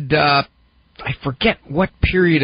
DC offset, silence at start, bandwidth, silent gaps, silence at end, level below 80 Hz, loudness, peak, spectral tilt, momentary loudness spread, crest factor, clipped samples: under 0.1%; 0 s; 5.2 kHz; none; 0 s; -32 dBFS; -18 LUFS; -2 dBFS; -4 dB/octave; 13 LU; 16 dB; under 0.1%